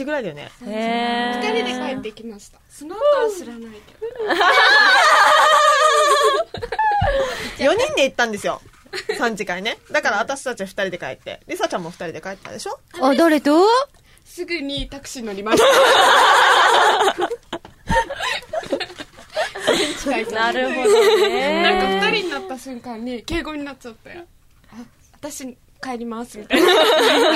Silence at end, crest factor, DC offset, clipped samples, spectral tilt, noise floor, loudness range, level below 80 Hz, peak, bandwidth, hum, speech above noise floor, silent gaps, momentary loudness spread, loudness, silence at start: 0 s; 16 dB; under 0.1%; under 0.1%; -2.5 dB/octave; -42 dBFS; 11 LU; -44 dBFS; -2 dBFS; 16 kHz; none; 23 dB; none; 20 LU; -17 LUFS; 0 s